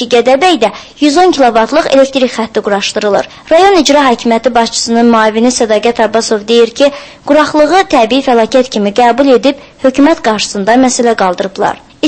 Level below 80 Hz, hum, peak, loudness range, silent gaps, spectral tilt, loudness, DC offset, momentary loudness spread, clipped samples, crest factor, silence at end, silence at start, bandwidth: -42 dBFS; none; 0 dBFS; 1 LU; none; -3.5 dB/octave; -9 LUFS; under 0.1%; 6 LU; 1%; 8 dB; 0 s; 0 s; 11 kHz